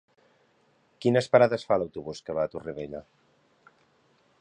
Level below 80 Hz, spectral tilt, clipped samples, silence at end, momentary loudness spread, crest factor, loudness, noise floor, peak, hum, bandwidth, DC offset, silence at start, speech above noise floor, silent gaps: -64 dBFS; -6.5 dB/octave; under 0.1%; 1.4 s; 16 LU; 24 dB; -26 LUFS; -66 dBFS; -6 dBFS; none; 10 kHz; under 0.1%; 1 s; 40 dB; none